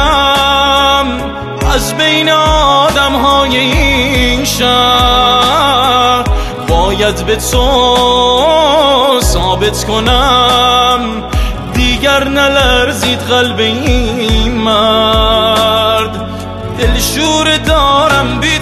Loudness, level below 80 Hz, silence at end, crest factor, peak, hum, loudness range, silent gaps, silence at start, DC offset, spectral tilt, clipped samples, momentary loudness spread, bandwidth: -9 LUFS; -20 dBFS; 0 s; 10 dB; 0 dBFS; none; 2 LU; none; 0 s; under 0.1%; -3.5 dB/octave; under 0.1%; 6 LU; 14 kHz